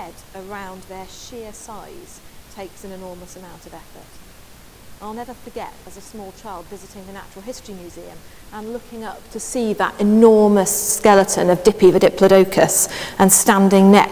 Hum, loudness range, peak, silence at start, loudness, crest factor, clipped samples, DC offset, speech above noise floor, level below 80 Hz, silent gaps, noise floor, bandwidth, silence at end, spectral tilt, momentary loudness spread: none; 23 LU; 0 dBFS; 0 s; -14 LUFS; 18 dB; under 0.1%; under 0.1%; 25 dB; -48 dBFS; none; -43 dBFS; 16 kHz; 0 s; -4.5 dB/octave; 25 LU